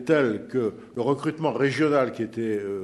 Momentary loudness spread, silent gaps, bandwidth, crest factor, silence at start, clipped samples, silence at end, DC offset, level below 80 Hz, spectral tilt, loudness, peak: 7 LU; none; 12 kHz; 18 dB; 0 s; under 0.1%; 0 s; under 0.1%; -68 dBFS; -7 dB/octave; -25 LUFS; -8 dBFS